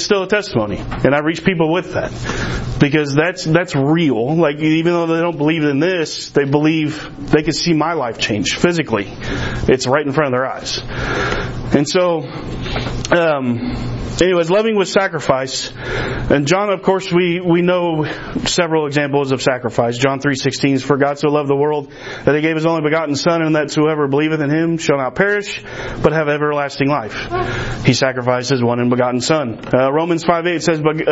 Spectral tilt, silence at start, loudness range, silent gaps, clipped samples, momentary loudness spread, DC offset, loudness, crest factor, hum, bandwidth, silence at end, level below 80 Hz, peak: -5.5 dB/octave; 0 s; 2 LU; none; under 0.1%; 7 LU; under 0.1%; -16 LUFS; 16 dB; none; 8 kHz; 0 s; -36 dBFS; 0 dBFS